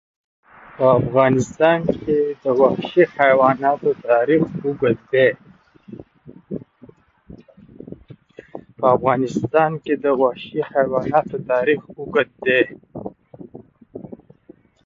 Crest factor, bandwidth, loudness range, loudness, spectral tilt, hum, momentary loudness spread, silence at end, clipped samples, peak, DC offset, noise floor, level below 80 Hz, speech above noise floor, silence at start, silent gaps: 18 dB; 7.6 kHz; 8 LU; -18 LUFS; -7 dB/octave; none; 21 LU; 0.8 s; under 0.1%; -2 dBFS; under 0.1%; -50 dBFS; -54 dBFS; 32 dB; 0.8 s; none